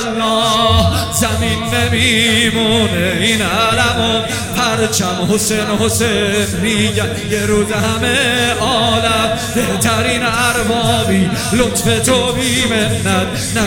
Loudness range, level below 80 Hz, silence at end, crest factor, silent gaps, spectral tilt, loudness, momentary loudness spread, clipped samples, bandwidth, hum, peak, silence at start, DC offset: 2 LU; -32 dBFS; 0 s; 14 dB; none; -3.5 dB/octave; -13 LUFS; 4 LU; under 0.1%; 18.5 kHz; none; 0 dBFS; 0 s; under 0.1%